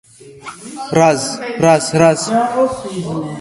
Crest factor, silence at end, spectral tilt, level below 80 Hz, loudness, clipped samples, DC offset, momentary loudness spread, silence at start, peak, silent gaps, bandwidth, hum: 16 dB; 0 s; -5 dB/octave; -52 dBFS; -15 LUFS; under 0.1%; under 0.1%; 18 LU; 0.2 s; 0 dBFS; none; 11.5 kHz; none